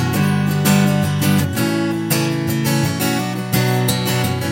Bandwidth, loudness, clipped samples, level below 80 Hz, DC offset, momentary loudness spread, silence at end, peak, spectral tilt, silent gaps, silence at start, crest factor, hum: 16.5 kHz; -17 LUFS; under 0.1%; -48 dBFS; under 0.1%; 4 LU; 0 s; -2 dBFS; -5 dB/octave; none; 0 s; 16 dB; none